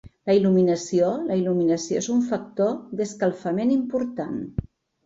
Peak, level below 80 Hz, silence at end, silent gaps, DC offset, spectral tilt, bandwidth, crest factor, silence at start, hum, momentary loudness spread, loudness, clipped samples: -8 dBFS; -52 dBFS; 0.45 s; none; under 0.1%; -6.5 dB/octave; 8 kHz; 16 dB; 0.05 s; none; 10 LU; -23 LUFS; under 0.1%